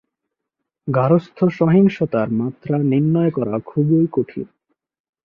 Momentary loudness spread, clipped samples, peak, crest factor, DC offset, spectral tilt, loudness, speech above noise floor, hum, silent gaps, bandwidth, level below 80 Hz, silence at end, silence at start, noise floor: 9 LU; under 0.1%; -4 dBFS; 16 dB; under 0.1%; -10.5 dB/octave; -18 LUFS; 63 dB; none; none; 6.2 kHz; -58 dBFS; 0.8 s; 0.85 s; -80 dBFS